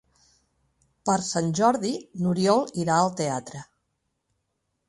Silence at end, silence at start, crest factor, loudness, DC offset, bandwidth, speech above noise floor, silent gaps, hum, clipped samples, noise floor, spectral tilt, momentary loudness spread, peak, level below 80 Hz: 1.25 s; 1.05 s; 20 dB; -25 LUFS; under 0.1%; 11.5 kHz; 53 dB; none; none; under 0.1%; -77 dBFS; -5 dB/octave; 10 LU; -6 dBFS; -64 dBFS